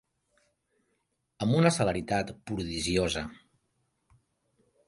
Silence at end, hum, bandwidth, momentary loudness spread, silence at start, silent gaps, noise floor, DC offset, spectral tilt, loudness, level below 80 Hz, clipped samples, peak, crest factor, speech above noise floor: 1.55 s; none; 11.5 kHz; 12 LU; 1.4 s; none; -78 dBFS; under 0.1%; -5 dB/octave; -29 LUFS; -52 dBFS; under 0.1%; -10 dBFS; 22 dB; 49 dB